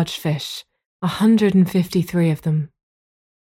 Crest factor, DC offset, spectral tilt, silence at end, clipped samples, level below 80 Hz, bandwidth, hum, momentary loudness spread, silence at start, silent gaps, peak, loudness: 14 dB; under 0.1%; -7 dB/octave; 0.75 s; under 0.1%; -56 dBFS; 16.5 kHz; none; 13 LU; 0 s; 0.86-1.00 s; -6 dBFS; -19 LUFS